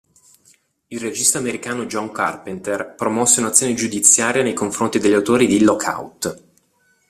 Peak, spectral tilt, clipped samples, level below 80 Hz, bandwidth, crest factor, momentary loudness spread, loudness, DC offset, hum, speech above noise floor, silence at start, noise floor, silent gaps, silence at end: 0 dBFS; -3 dB/octave; under 0.1%; -58 dBFS; 15.5 kHz; 20 dB; 14 LU; -17 LUFS; under 0.1%; none; 43 dB; 0.9 s; -61 dBFS; none; 0.7 s